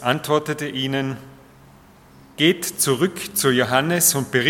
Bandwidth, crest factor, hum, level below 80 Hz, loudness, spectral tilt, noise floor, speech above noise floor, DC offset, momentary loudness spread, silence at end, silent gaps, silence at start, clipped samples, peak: 17.5 kHz; 20 dB; none; -60 dBFS; -20 LUFS; -3 dB/octave; -48 dBFS; 28 dB; under 0.1%; 9 LU; 0 s; none; 0 s; under 0.1%; -2 dBFS